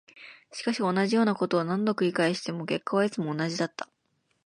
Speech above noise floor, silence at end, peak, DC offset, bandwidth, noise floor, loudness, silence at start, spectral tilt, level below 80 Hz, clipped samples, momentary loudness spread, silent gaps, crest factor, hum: 47 dB; 0.6 s; -12 dBFS; under 0.1%; 11.5 kHz; -74 dBFS; -27 LUFS; 0.15 s; -5.5 dB/octave; -76 dBFS; under 0.1%; 16 LU; none; 16 dB; none